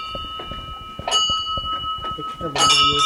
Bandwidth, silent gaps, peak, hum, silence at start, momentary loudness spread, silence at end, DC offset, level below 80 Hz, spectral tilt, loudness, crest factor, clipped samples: 16 kHz; none; -4 dBFS; none; 0 s; 17 LU; 0 s; under 0.1%; -42 dBFS; -1 dB/octave; -19 LUFS; 18 dB; under 0.1%